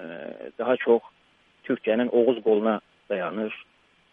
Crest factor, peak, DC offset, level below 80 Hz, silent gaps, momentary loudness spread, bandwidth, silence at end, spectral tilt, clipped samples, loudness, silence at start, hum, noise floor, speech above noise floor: 18 dB; -8 dBFS; under 0.1%; -74 dBFS; none; 16 LU; 3.8 kHz; 0.5 s; -8.5 dB/octave; under 0.1%; -25 LUFS; 0 s; none; -59 dBFS; 35 dB